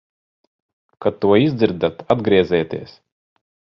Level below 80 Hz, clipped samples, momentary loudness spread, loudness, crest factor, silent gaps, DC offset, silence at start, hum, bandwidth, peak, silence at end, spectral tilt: -50 dBFS; under 0.1%; 9 LU; -18 LUFS; 20 dB; none; under 0.1%; 1 s; none; 6 kHz; 0 dBFS; 0.9 s; -8.5 dB/octave